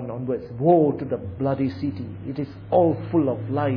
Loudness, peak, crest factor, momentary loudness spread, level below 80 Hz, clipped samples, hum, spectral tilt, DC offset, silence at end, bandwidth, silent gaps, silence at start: -23 LUFS; -6 dBFS; 16 dB; 12 LU; -54 dBFS; under 0.1%; none; -11.5 dB/octave; under 0.1%; 0 s; 5.4 kHz; none; 0 s